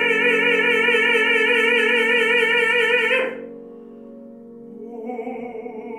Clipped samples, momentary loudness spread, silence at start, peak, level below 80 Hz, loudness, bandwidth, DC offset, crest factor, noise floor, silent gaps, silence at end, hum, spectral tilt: under 0.1%; 18 LU; 0 s; -6 dBFS; -72 dBFS; -16 LUFS; 14 kHz; under 0.1%; 16 dB; -40 dBFS; none; 0 s; none; -2.5 dB/octave